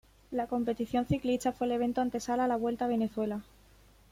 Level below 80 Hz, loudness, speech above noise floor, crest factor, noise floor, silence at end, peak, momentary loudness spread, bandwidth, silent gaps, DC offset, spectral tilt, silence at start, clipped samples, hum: -58 dBFS; -32 LUFS; 29 dB; 16 dB; -60 dBFS; 0.7 s; -16 dBFS; 6 LU; 16 kHz; none; under 0.1%; -6 dB/octave; 0.3 s; under 0.1%; none